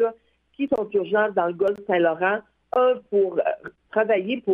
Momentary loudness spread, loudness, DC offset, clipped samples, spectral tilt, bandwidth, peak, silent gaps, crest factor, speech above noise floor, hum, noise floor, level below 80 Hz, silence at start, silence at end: 6 LU; -23 LUFS; under 0.1%; under 0.1%; -7.5 dB/octave; 4.2 kHz; -8 dBFS; none; 16 dB; 25 dB; none; -47 dBFS; -66 dBFS; 0 s; 0 s